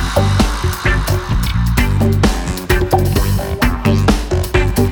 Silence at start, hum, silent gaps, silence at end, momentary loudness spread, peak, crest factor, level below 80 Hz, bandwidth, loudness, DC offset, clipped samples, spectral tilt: 0 s; none; none; 0 s; 3 LU; 0 dBFS; 14 dB; -20 dBFS; over 20 kHz; -15 LUFS; under 0.1%; under 0.1%; -5.5 dB/octave